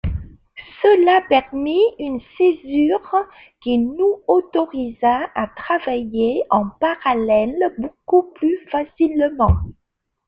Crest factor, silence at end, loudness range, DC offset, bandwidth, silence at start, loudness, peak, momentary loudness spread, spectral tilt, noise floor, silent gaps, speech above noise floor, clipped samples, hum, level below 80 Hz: 16 dB; 0.55 s; 2 LU; under 0.1%; 5.2 kHz; 0.05 s; -18 LUFS; -2 dBFS; 10 LU; -9 dB/octave; -75 dBFS; none; 57 dB; under 0.1%; none; -36 dBFS